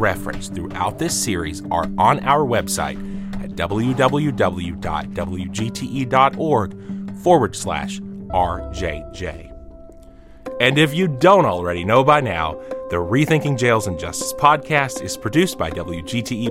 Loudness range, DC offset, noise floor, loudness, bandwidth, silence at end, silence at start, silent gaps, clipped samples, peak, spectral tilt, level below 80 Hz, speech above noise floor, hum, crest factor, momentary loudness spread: 5 LU; under 0.1%; -42 dBFS; -19 LUFS; 16.5 kHz; 0 s; 0 s; none; under 0.1%; -2 dBFS; -5 dB/octave; -40 dBFS; 23 dB; none; 18 dB; 13 LU